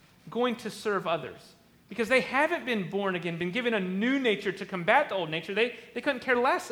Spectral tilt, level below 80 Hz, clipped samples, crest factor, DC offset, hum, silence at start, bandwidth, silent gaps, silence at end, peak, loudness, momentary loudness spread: -5 dB/octave; -70 dBFS; under 0.1%; 22 dB; under 0.1%; none; 0.25 s; 18.5 kHz; none; 0 s; -8 dBFS; -28 LUFS; 8 LU